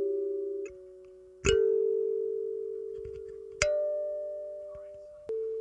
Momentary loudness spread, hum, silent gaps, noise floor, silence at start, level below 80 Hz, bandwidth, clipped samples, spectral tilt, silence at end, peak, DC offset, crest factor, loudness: 19 LU; none; none; -52 dBFS; 0 s; -52 dBFS; 10 kHz; under 0.1%; -4 dB/octave; 0 s; -6 dBFS; under 0.1%; 26 dB; -32 LUFS